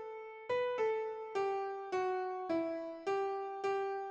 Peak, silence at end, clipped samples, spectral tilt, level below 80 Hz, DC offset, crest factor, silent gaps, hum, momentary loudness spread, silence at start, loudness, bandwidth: -24 dBFS; 0 s; under 0.1%; -5 dB/octave; -84 dBFS; under 0.1%; 14 dB; none; none; 5 LU; 0 s; -38 LUFS; 8 kHz